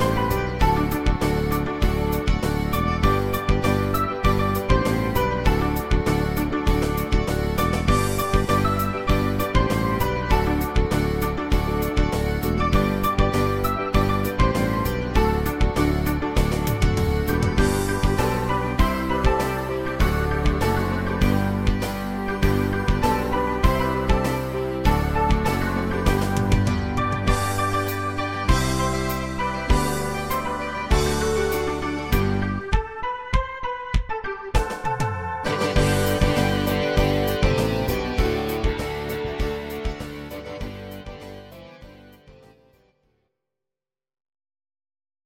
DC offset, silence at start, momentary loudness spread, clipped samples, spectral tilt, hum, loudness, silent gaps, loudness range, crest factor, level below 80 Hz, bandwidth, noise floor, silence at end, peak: under 0.1%; 0 s; 6 LU; under 0.1%; -6 dB/octave; none; -23 LUFS; none; 4 LU; 18 dB; -28 dBFS; 17 kHz; under -90 dBFS; 2.95 s; -4 dBFS